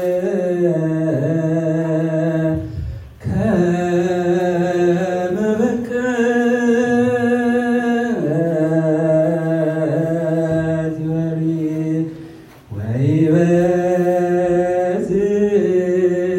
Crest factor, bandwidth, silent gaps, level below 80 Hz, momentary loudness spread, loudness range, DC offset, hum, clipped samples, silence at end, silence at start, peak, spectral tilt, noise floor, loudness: 14 dB; 11 kHz; none; -44 dBFS; 6 LU; 3 LU; under 0.1%; none; under 0.1%; 0 s; 0 s; -4 dBFS; -8 dB/octave; -38 dBFS; -17 LUFS